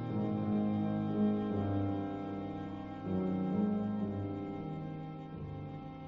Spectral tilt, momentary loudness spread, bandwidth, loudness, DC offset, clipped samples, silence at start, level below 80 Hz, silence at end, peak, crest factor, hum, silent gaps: -9 dB/octave; 11 LU; 5 kHz; -36 LUFS; under 0.1%; under 0.1%; 0 s; -62 dBFS; 0 s; -22 dBFS; 14 dB; none; none